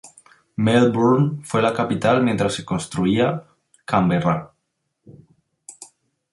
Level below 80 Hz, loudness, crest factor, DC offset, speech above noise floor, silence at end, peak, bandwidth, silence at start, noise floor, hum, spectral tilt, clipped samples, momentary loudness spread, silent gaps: -54 dBFS; -20 LUFS; 18 dB; under 0.1%; 56 dB; 0.5 s; -4 dBFS; 11.5 kHz; 0.05 s; -74 dBFS; none; -6.5 dB/octave; under 0.1%; 15 LU; none